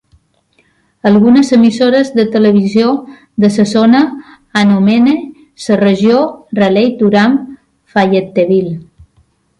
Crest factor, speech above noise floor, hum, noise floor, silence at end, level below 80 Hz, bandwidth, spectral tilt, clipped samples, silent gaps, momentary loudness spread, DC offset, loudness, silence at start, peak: 10 dB; 46 dB; none; -55 dBFS; 0.75 s; -52 dBFS; 11 kHz; -6.5 dB/octave; under 0.1%; none; 10 LU; under 0.1%; -10 LUFS; 1.05 s; 0 dBFS